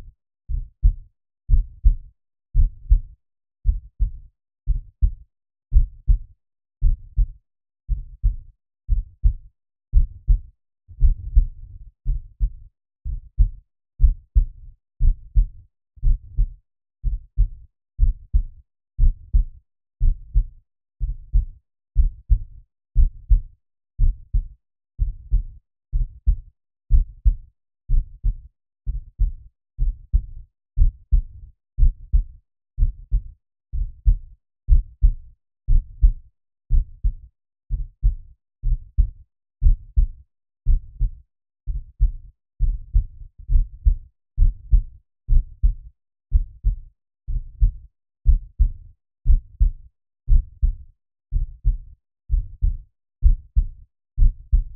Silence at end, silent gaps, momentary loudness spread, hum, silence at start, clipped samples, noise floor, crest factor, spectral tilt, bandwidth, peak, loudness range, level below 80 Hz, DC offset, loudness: 0 s; none; 14 LU; none; 0.5 s; under 0.1%; -39 dBFS; 18 dB; -19.5 dB/octave; 0.5 kHz; -2 dBFS; 3 LU; -22 dBFS; under 0.1%; -26 LUFS